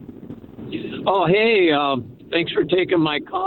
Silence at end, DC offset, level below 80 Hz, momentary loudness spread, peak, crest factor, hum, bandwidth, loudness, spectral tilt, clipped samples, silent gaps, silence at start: 0 s; under 0.1%; -56 dBFS; 21 LU; -4 dBFS; 16 dB; none; 4.4 kHz; -19 LUFS; -8.5 dB/octave; under 0.1%; none; 0 s